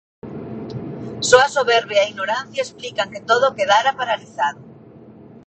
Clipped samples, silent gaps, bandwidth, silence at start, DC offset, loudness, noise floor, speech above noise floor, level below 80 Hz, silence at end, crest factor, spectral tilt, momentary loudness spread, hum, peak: under 0.1%; none; 9.2 kHz; 0.25 s; under 0.1%; -18 LUFS; -43 dBFS; 24 dB; -58 dBFS; 0.1 s; 20 dB; -2.5 dB/octave; 17 LU; none; 0 dBFS